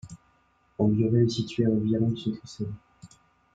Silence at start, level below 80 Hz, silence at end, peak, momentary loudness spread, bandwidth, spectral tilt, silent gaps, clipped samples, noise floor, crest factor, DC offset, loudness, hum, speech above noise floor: 0.05 s; -58 dBFS; 0.5 s; -10 dBFS; 19 LU; 7.8 kHz; -8 dB/octave; none; under 0.1%; -66 dBFS; 18 dB; under 0.1%; -26 LUFS; none; 41 dB